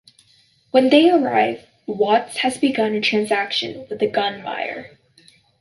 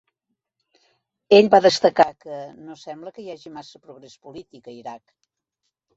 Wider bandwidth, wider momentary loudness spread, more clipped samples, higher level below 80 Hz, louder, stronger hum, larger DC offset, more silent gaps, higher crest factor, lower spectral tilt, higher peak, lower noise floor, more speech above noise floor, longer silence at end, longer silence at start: first, 11.5 kHz vs 8 kHz; second, 14 LU vs 26 LU; neither; about the same, -66 dBFS vs -68 dBFS; second, -19 LUFS vs -16 LUFS; neither; neither; neither; about the same, 18 dB vs 22 dB; about the same, -4 dB/octave vs -4.5 dB/octave; about the same, -2 dBFS vs -2 dBFS; second, -57 dBFS vs -79 dBFS; second, 39 dB vs 59 dB; second, 0.75 s vs 1 s; second, 0.75 s vs 1.3 s